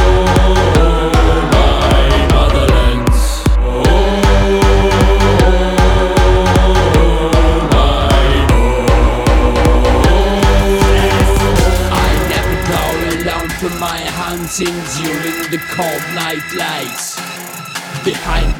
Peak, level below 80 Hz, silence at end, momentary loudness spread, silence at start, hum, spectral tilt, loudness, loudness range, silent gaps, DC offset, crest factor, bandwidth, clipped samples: 0 dBFS; -14 dBFS; 0 s; 8 LU; 0 s; none; -5.5 dB/octave; -13 LUFS; 7 LU; none; under 0.1%; 10 dB; 17 kHz; under 0.1%